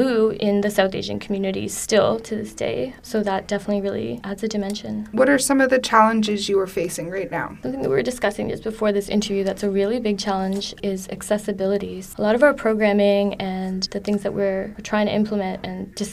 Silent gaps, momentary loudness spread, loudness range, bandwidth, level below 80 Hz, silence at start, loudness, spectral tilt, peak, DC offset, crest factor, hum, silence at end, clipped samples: none; 10 LU; 4 LU; 15.5 kHz; -48 dBFS; 0 s; -22 LUFS; -4.5 dB/octave; 0 dBFS; under 0.1%; 20 dB; none; 0 s; under 0.1%